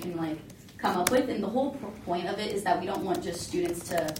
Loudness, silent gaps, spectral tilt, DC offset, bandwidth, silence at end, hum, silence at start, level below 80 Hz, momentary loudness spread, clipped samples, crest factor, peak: -30 LUFS; none; -4.5 dB/octave; under 0.1%; 16.5 kHz; 0 s; none; 0 s; -58 dBFS; 9 LU; under 0.1%; 26 dB; -4 dBFS